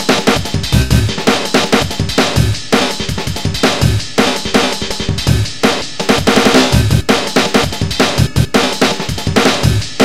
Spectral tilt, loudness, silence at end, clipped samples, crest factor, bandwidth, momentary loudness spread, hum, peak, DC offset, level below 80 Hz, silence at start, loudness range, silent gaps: -4.5 dB/octave; -13 LUFS; 0 s; 0.3%; 14 dB; 16.5 kHz; 5 LU; none; 0 dBFS; 5%; -26 dBFS; 0 s; 2 LU; none